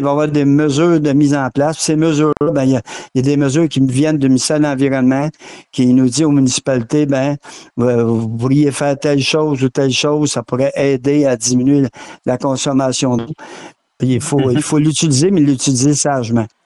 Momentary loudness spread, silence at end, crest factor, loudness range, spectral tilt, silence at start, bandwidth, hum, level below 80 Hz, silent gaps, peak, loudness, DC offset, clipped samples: 6 LU; 0.2 s; 10 dB; 2 LU; -5.5 dB/octave; 0 s; 12 kHz; none; -48 dBFS; none; -4 dBFS; -14 LUFS; under 0.1%; under 0.1%